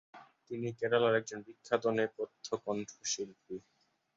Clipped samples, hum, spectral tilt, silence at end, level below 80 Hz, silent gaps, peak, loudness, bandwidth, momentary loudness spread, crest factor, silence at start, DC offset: under 0.1%; none; -4 dB/octave; 0.55 s; -78 dBFS; none; -14 dBFS; -35 LUFS; 7.8 kHz; 17 LU; 22 dB; 0.15 s; under 0.1%